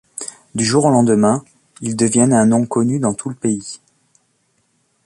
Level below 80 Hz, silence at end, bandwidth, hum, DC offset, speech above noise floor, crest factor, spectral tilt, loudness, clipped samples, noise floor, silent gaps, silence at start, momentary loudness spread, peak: -54 dBFS; 1.3 s; 11.5 kHz; none; under 0.1%; 48 dB; 18 dB; -5.5 dB/octave; -16 LUFS; under 0.1%; -63 dBFS; none; 0.2 s; 16 LU; 0 dBFS